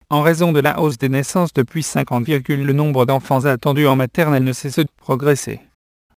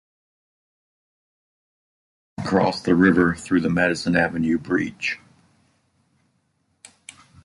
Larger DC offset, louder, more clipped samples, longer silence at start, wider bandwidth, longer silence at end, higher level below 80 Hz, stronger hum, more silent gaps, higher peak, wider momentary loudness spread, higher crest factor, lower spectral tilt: neither; first, -17 LUFS vs -21 LUFS; neither; second, 0.1 s vs 2.4 s; first, 15.5 kHz vs 11.5 kHz; second, 0.6 s vs 2.3 s; about the same, -54 dBFS vs -52 dBFS; neither; neither; first, 0 dBFS vs -4 dBFS; second, 6 LU vs 14 LU; second, 16 dB vs 22 dB; about the same, -6 dB/octave vs -6 dB/octave